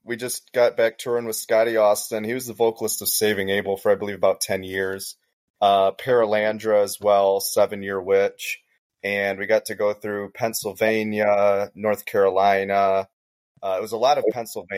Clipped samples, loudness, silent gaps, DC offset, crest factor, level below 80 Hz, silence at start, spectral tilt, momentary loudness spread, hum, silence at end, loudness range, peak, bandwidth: under 0.1%; -22 LUFS; 5.33-5.54 s, 8.78-8.90 s, 13.13-13.55 s; under 0.1%; 16 dB; -70 dBFS; 0.05 s; -3.5 dB/octave; 9 LU; none; 0 s; 2 LU; -6 dBFS; 16 kHz